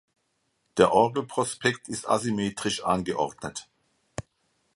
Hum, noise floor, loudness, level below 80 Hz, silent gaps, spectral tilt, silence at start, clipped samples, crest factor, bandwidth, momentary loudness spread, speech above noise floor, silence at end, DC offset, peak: none; -74 dBFS; -26 LUFS; -58 dBFS; none; -4.5 dB/octave; 0.75 s; under 0.1%; 24 dB; 11.5 kHz; 20 LU; 48 dB; 0.55 s; under 0.1%; -4 dBFS